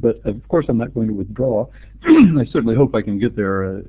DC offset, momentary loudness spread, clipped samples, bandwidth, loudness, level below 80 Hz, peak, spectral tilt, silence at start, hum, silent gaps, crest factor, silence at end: under 0.1%; 12 LU; under 0.1%; 4 kHz; -17 LUFS; -38 dBFS; 0 dBFS; -12.5 dB/octave; 0 s; none; none; 16 dB; 0 s